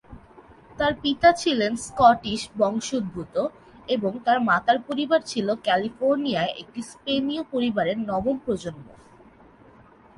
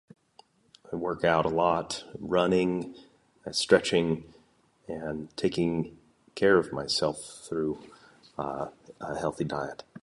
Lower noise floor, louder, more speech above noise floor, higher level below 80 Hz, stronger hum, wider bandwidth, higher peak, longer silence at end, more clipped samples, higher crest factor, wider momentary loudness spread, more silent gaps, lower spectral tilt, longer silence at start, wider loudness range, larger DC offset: second, -52 dBFS vs -64 dBFS; first, -24 LUFS vs -28 LUFS; second, 28 dB vs 36 dB; about the same, -54 dBFS vs -58 dBFS; neither; about the same, 11.5 kHz vs 11.5 kHz; about the same, -4 dBFS vs -6 dBFS; first, 1.25 s vs 0.05 s; neither; about the same, 20 dB vs 24 dB; second, 11 LU vs 16 LU; neither; about the same, -4.5 dB/octave vs -5 dB/octave; second, 0.1 s vs 0.9 s; about the same, 5 LU vs 3 LU; neither